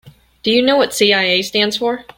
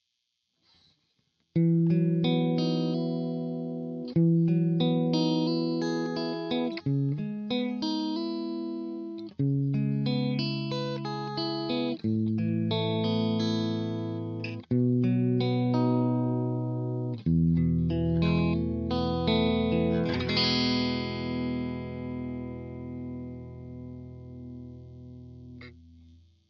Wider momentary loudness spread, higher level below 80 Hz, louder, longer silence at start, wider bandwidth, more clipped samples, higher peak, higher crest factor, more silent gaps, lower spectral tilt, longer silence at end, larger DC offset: second, 5 LU vs 15 LU; about the same, -56 dBFS vs -54 dBFS; first, -14 LUFS vs -28 LUFS; second, 0.05 s vs 1.55 s; first, 17 kHz vs 6.6 kHz; neither; first, -2 dBFS vs -12 dBFS; about the same, 14 dB vs 16 dB; neither; second, -3 dB/octave vs -7.5 dB/octave; second, 0.15 s vs 0.7 s; neither